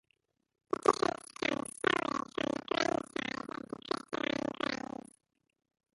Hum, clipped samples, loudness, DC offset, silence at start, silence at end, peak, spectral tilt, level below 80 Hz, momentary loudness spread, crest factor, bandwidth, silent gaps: none; under 0.1%; -35 LUFS; under 0.1%; 0.7 s; 1.2 s; -10 dBFS; -3.5 dB/octave; -70 dBFS; 11 LU; 26 dB; 11.5 kHz; none